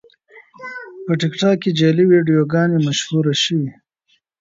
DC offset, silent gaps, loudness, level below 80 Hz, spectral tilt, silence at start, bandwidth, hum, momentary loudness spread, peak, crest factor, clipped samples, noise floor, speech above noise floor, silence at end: under 0.1%; none; -16 LUFS; -62 dBFS; -5.5 dB/octave; 0.35 s; 7.8 kHz; none; 18 LU; -2 dBFS; 14 dB; under 0.1%; -64 dBFS; 48 dB; 0.7 s